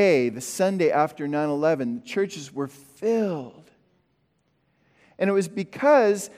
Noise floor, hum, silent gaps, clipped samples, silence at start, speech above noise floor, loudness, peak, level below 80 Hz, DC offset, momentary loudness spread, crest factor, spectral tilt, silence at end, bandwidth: -69 dBFS; none; none; under 0.1%; 0 s; 46 dB; -24 LUFS; -6 dBFS; -74 dBFS; under 0.1%; 13 LU; 18 dB; -5.5 dB/octave; 0.1 s; 16 kHz